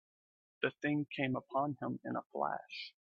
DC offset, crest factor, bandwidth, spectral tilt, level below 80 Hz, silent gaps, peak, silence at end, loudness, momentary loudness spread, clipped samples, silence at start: under 0.1%; 22 dB; 6.6 kHz; -4.5 dB/octave; -82 dBFS; 2.26-2.30 s; -18 dBFS; 0.2 s; -38 LUFS; 6 LU; under 0.1%; 0.6 s